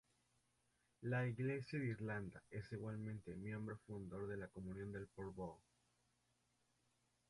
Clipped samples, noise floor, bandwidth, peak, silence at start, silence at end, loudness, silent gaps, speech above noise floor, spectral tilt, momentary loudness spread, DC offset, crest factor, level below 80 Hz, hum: under 0.1%; -83 dBFS; 11.5 kHz; -32 dBFS; 1 s; 1.7 s; -48 LUFS; none; 36 dB; -8 dB/octave; 10 LU; under 0.1%; 16 dB; -72 dBFS; 60 Hz at -70 dBFS